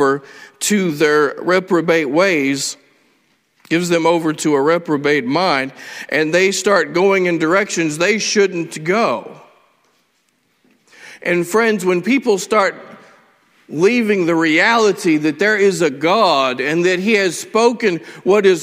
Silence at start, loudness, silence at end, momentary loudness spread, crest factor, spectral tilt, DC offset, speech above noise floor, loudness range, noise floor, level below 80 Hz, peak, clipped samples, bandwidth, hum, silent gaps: 0 s; -15 LUFS; 0 s; 6 LU; 16 dB; -4 dB/octave; under 0.1%; 47 dB; 5 LU; -62 dBFS; -64 dBFS; 0 dBFS; under 0.1%; 16 kHz; none; none